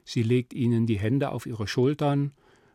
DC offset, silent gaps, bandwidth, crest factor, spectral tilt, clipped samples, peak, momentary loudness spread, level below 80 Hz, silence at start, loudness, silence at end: under 0.1%; none; 13.5 kHz; 14 dB; -7.5 dB/octave; under 0.1%; -12 dBFS; 6 LU; -64 dBFS; 0.05 s; -26 LUFS; 0.45 s